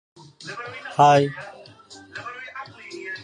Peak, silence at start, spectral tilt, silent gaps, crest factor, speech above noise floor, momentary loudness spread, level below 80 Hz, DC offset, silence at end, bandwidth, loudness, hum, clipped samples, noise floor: -4 dBFS; 0.45 s; -5.5 dB/octave; none; 20 dB; 27 dB; 23 LU; -68 dBFS; under 0.1%; 0.05 s; 10.5 kHz; -20 LUFS; none; under 0.1%; -46 dBFS